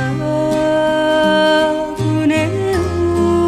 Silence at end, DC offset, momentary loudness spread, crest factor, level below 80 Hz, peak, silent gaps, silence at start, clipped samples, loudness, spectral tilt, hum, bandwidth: 0 s; under 0.1%; 5 LU; 14 dB; -38 dBFS; -2 dBFS; none; 0 s; under 0.1%; -15 LUFS; -6 dB/octave; none; 14 kHz